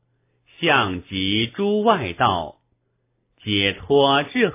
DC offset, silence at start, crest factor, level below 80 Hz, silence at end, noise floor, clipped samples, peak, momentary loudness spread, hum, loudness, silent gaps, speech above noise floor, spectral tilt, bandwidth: under 0.1%; 0.6 s; 20 dB; -48 dBFS; 0 s; -70 dBFS; under 0.1%; -2 dBFS; 7 LU; none; -20 LUFS; none; 50 dB; -9 dB/octave; 3.8 kHz